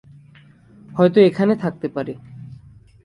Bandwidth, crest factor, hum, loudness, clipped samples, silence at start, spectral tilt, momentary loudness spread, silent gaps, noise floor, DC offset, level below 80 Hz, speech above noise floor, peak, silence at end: 10.5 kHz; 18 dB; none; -18 LUFS; under 0.1%; 0.9 s; -8.5 dB/octave; 25 LU; none; -48 dBFS; under 0.1%; -58 dBFS; 31 dB; -2 dBFS; 0.5 s